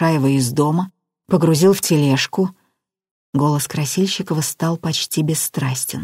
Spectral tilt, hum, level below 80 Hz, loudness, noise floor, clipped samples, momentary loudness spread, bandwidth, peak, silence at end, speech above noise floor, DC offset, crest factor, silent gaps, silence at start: -5 dB/octave; none; -58 dBFS; -18 LUFS; -69 dBFS; under 0.1%; 7 LU; 16 kHz; -2 dBFS; 0 s; 52 dB; under 0.1%; 16 dB; 3.11-3.33 s; 0 s